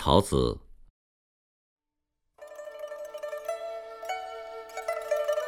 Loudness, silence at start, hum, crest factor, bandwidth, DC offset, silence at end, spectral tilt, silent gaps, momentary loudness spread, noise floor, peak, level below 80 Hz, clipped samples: -32 LUFS; 0 s; none; 28 dB; 18 kHz; under 0.1%; 0 s; -5.5 dB/octave; 0.90-1.77 s; 16 LU; -83 dBFS; -4 dBFS; -46 dBFS; under 0.1%